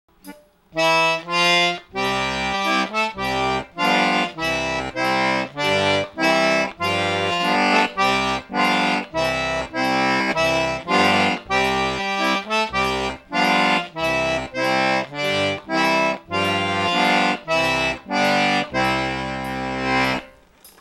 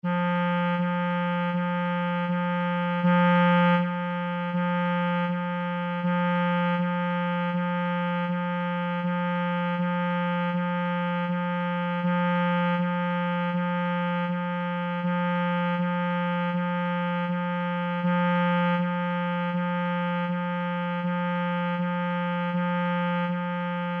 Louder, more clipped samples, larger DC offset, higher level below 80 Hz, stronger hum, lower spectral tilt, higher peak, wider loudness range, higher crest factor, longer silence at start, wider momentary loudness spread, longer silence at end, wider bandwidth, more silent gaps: first, -20 LUFS vs -26 LUFS; neither; neither; first, -46 dBFS vs -82 dBFS; neither; second, -3.5 dB/octave vs -9.5 dB/octave; first, -4 dBFS vs -14 dBFS; about the same, 2 LU vs 3 LU; first, 18 dB vs 12 dB; first, 0.25 s vs 0.05 s; about the same, 6 LU vs 5 LU; first, 0.15 s vs 0 s; first, 16.5 kHz vs 3.9 kHz; neither